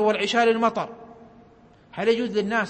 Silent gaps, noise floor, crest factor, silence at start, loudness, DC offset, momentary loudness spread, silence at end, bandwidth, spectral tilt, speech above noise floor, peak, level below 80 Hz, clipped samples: none; -53 dBFS; 16 dB; 0 s; -22 LUFS; under 0.1%; 17 LU; 0 s; 8.8 kHz; -4.5 dB/octave; 31 dB; -8 dBFS; -62 dBFS; under 0.1%